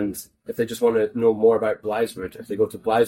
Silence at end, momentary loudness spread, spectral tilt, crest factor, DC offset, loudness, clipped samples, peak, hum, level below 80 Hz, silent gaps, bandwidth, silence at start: 0 s; 14 LU; -5.5 dB/octave; 16 dB; under 0.1%; -22 LUFS; under 0.1%; -6 dBFS; none; -58 dBFS; none; 17 kHz; 0 s